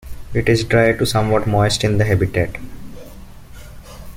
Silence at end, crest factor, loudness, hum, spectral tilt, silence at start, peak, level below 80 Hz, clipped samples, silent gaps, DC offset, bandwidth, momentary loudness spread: 0 s; 16 dB; -17 LUFS; none; -5.5 dB/octave; 0.05 s; -2 dBFS; -34 dBFS; under 0.1%; none; under 0.1%; 16 kHz; 22 LU